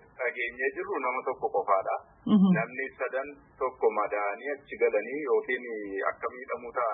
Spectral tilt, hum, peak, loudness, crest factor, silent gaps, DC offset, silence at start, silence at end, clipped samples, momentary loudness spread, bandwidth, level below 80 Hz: -11 dB/octave; none; -12 dBFS; -30 LUFS; 18 dB; none; under 0.1%; 0.2 s; 0 s; under 0.1%; 10 LU; 3.8 kHz; -68 dBFS